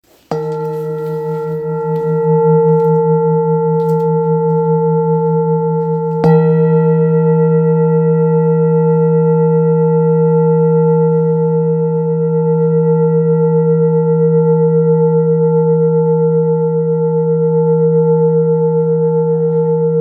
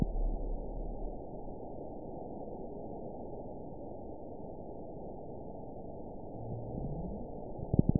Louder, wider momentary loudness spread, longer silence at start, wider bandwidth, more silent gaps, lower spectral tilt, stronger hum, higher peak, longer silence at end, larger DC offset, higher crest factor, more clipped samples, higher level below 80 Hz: first, -13 LUFS vs -43 LUFS; about the same, 5 LU vs 7 LU; first, 0.3 s vs 0 s; first, 2.7 kHz vs 1 kHz; neither; first, -12 dB/octave vs -6.5 dB/octave; neither; first, 0 dBFS vs -10 dBFS; about the same, 0 s vs 0 s; second, under 0.1% vs 0.4%; second, 12 dB vs 28 dB; neither; second, -60 dBFS vs -44 dBFS